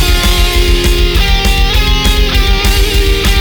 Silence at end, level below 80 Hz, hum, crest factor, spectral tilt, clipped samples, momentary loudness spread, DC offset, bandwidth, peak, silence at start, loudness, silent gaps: 0 s; -10 dBFS; none; 8 dB; -4 dB/octave; under 0.1%; 1 LU; under 0.1%; over 20 kHz; 0 dBFS; 0 s; -11 LUFS; none